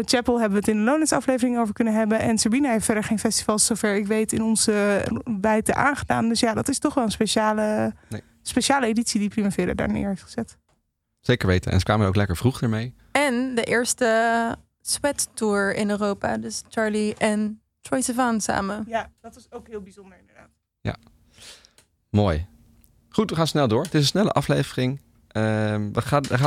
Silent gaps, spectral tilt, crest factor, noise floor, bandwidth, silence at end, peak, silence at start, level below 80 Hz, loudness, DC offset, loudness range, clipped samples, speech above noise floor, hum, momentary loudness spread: none; -4.5 dB/octave; 16 dB; -73 dBFS; 15 kHz; 0 s; -6 dBFS; 0 s; -46 dBFS; -23 LUFS; under 0.1%; 7 LU; under 0.1%; 50 dB; none; 11 LU